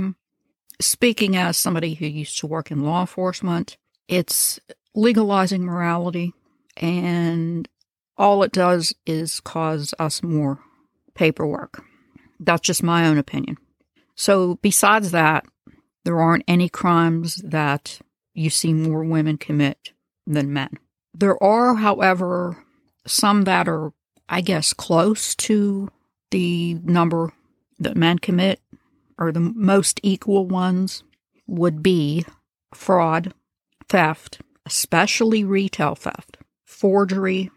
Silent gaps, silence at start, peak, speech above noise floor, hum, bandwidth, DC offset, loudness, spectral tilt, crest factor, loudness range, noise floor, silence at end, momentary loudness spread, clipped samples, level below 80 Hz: none; 0 s; -2 dBFS; 56 dB; none; 15 kHz; under 0.1%; -20 LUFS; -4.5 dB/octave; 18 dB; 4 LU; -76 dBFS; 0.05 s; 13 LU; under 0.1%; -60 dBFS